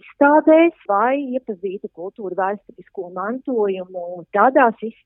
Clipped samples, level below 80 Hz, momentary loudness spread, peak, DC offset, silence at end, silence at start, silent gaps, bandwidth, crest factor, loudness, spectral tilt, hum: under 0.1%; -72 dBFS; 17 LU; 0 dBFS; under 0.1%; 0.15 s; 0.2 s; none; 3.6 kHz; 18 dB; -18 LUFS; -10 dB/octave; none